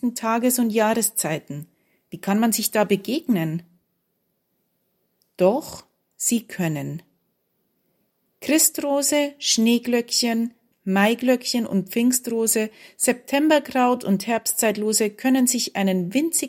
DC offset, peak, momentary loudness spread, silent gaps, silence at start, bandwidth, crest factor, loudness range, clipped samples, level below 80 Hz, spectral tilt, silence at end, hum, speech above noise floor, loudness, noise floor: under 0.1%; -4 dBFS; 11 LU; none; 0.05 s; 16.5 kHz; 18 dB; 6 LU; under 0.1%; -70 dBFS; -3.5 dB/octave; 0 s; none; 51 dB; -21 LUFS; -73 dBFS